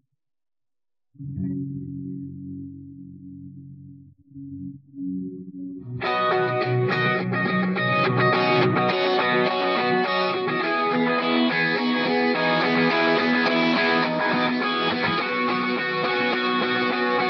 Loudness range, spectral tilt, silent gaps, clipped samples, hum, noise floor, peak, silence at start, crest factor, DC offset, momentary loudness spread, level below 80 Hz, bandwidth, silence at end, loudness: 16 LU; -7 dB/octave; none; under 0.1%; none; under -90 dBFS; -8 dBFS; 1.2 s; 16 dB; under 0.1%; 18 LU; -64 dBFS; 6.6 kHz; 0 s; -22 LUFS